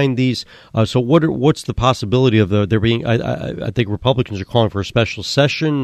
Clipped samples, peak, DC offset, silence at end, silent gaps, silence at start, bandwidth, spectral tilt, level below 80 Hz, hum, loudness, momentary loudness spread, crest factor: under 0.1%; 0 dBFS; under 0.1%; 0 s; none; 0 s; 12.5 kHz; -6.5 dB/octave; -40 dBFS; none; -17 LUFS; 6 LU; 16 dB